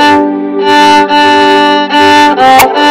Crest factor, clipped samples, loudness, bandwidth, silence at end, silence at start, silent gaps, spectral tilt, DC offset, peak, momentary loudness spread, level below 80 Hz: 6 dB; 2%; -5 LUFS; over 20 kHz; 0 s; 0 s; none; -3 dB/octave; under 0.1%; 0 dBFS; 4 LU; -44 dBFS